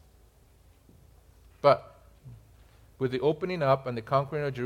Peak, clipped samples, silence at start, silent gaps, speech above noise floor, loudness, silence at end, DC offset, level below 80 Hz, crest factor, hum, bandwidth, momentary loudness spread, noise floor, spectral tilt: -6 dBFS; under 0.1%; 1.65 s; none; 32 dB; -28 LUFS; 0 s; under 0.1%; -58 dBFS; 24 dB; none; 15 kHz; 8 LU; -59 dBFS; -7.5 dB/octave